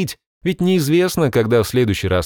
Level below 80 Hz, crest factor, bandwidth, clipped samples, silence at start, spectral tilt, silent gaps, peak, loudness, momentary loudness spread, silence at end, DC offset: -42 dBFS; 12 dB; over 20 kHz; under 0.1%; 0 s; -6 dB/octave; 0.26-0.41 s; -4 dBFS; -17 LUFS; 9 LU; 0 s; under 0.1%